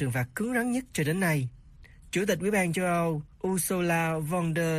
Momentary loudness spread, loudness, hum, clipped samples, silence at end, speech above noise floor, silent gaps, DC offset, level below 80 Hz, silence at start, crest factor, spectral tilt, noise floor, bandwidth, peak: 5 LU; -28 LUFS; none; under 0.1%; 0 s; 24 dB; none; under 0.1%; -54 dBFS; 0 s; 14 dB; -5.5 dB/octave; -51 dBFS; 15.5 kHz; -14 dBFS